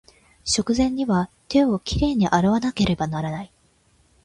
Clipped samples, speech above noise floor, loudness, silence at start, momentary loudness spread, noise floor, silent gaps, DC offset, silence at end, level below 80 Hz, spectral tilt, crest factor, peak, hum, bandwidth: under 0.1%; 40 dB; -22 LUFS; 0.45 s; 10 LU; -60 dBFS; none; under 0.1%; 0.8 s; -40 dBFS; -5 dB/octave; 18 dB; -4 dBFS; none; 11.5 kHz